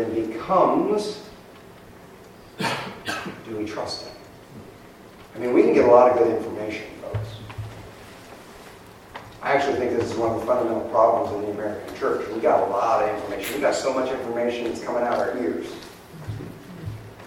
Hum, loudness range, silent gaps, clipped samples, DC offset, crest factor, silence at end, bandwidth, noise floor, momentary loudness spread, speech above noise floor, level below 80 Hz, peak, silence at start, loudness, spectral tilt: none; 11 LU; none; under 0.1%; under 0.1%; 22 dB; 0 s; 16 kHz; -45 dBFS; 23 LU; 24 dB; -54 dBFS; -2 dBFS; 0 s; -23 LUFS; -5.5 dB/octave